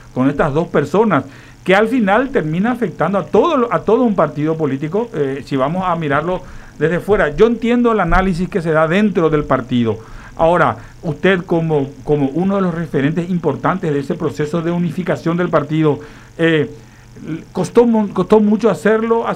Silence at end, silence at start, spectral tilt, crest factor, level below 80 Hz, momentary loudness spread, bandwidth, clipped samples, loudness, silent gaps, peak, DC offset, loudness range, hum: 0 s; 0 s; -7.5 dB/octave; 14 dB; -34 dBFS; 7 LU; 12 kHz; under 0.1%; -16 LUFS; none; 0 dBFS; under 0.1%; 3 LU; none